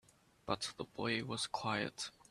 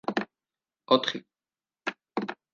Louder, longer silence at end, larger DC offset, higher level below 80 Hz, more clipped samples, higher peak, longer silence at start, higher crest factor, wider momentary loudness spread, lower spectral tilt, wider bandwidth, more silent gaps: second, -40 LUFS vs -30 LUFS; about the same, 0.2 s vs 0.2 s; neither; first, -70 dBFS vs -80 dBFS; neither; second, -20 dBFS vs -6 dBFS; first, 0.45 s vs 0.1 s; about the same, 22 dB vs 26 dB; second, 6 LU vs 14 LU; about the same, -3.5 dB/octave vs -4.5 dB/octave; first, 14 kHz vs 7.4 kHz; neither